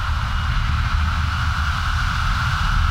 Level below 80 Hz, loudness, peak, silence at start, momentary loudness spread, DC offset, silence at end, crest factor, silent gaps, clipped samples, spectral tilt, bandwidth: -22 dBFS; -21 LUFS; -8 dBFS; 0 s; 2 LU; under 0.1%; 0 s; 12 dB; none; under 0.1%; -4.5 dB/octave; 14 kHz